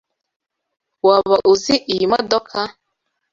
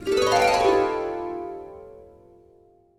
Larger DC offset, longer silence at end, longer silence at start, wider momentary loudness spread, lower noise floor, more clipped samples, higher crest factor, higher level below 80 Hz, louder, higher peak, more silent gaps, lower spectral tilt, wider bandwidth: neither; second, 0.6 s vs 0.95 s; first, 1.05 s vs 0 s; second, 11 LU vs 21 LU; first, -74 dBFS vs -56 dBFS; neither; about the same, 18 dB vs 18 dB; about the same, -56 dBFS vs -52 dBFS; first, -16 LUFS vs -22 LUFS; first, 0 dBFS vs -8 dBFS; neither; about the same, -4 dB/octave vs -3.5 dB/octave; second, 7.6 kHz vs 16 kHz